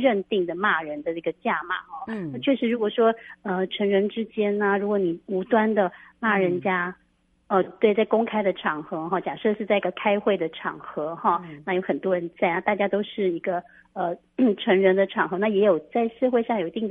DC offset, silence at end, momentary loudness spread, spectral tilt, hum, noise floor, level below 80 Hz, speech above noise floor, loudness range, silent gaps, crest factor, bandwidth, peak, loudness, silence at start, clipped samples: under 0.1%; 0 s; 9 LU; -9 dB/octave; none; -52 dBFS; -68 dBFS; 28 dB; 3 LU; none; 18 dB; 3.9 kHz; -6 dBFS; -24 LUFS; 0 s; under 0.1%